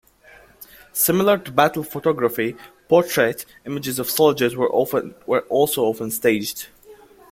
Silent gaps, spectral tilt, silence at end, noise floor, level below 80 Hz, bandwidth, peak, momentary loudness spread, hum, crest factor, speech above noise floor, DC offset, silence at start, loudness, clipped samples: none; -4 dB/octave; 0.4 s; -49 dBFS; -60 dBFS; 16.5 kHz; -2 dBFS; 11 LU; none; 20 dB; 30 dB; under 0.1%; 0.6 s; -20 LUFS; under 0.1%